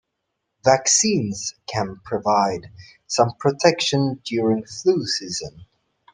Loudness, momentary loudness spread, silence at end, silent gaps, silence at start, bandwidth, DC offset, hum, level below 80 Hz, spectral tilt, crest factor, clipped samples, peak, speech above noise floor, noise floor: -21 LUFS; 11 LU; 0.5 s; none; 0.65 s; 11 kHz; under 0.1%; none; -58 dBFS; -3.5 dB/octave; 22 dB; under 0.1%; 0 dBFS; 56 dB; -78 dBFS